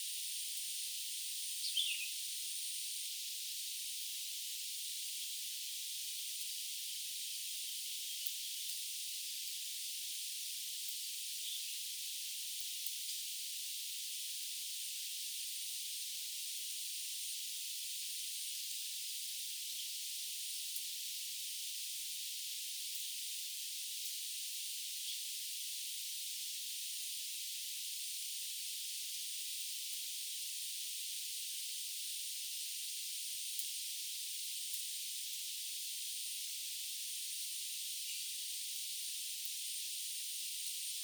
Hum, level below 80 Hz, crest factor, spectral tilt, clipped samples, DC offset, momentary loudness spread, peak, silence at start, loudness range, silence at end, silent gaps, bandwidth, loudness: none; under -90 dBFS; 28 dB; 11 dB/octave; under 0.1%; under 0.1%; 1 LU; -16 dBFS; 0 s; 1 LU; 0 s; none; over 20 kHz; -40 LUFS